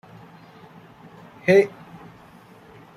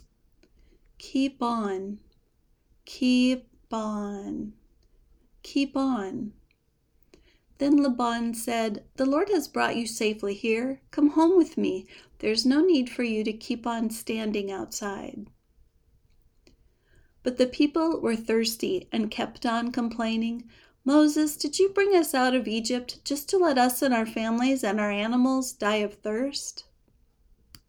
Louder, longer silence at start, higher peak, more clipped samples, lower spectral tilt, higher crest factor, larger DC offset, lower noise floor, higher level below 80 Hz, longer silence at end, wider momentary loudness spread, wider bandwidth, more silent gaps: first, -20 LUFS vs -26 LUFS; first, 1.45 s vs 1 s; first, -4 dBFS vs -10 dBFS; neither; first, -6.5 dB/octave vs -4 dB/octave; about the same, 22 dB vs 18 dB; neither; second, -48 dBFS vs -68 dBFS; second, -66 dBFS vs -60 dBFS; first, 1.3 s vs 1.1 s; first, 27 LU vs 12 LU; second, 11 kHz vs over 20 kHz; neither